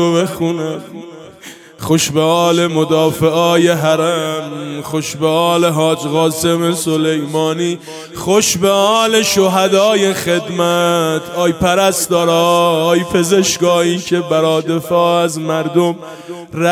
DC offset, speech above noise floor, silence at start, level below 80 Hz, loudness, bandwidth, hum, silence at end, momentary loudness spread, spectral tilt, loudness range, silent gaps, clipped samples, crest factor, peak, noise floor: under 0.1%; 23 dB; 0 s; -48 dBFS; -14 LUFS; 16 kHz; none; 0 s; 12 LU; -4.5 dB/octave; 2 LU; none; under 0.1%; 14 dB; 0 dBFS; -37 dBFS